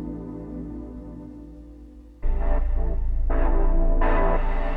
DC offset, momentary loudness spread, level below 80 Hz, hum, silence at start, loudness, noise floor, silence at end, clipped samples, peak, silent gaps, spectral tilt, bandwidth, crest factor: under 0.1%; 19 LU; -22 dBFS; none; 0 s; -28 LUFS; -44 dBFS; 0 s; under 0.1%; -10 dBFS; none; -9.5 dB/octave; 3.1 kHz; 12 dB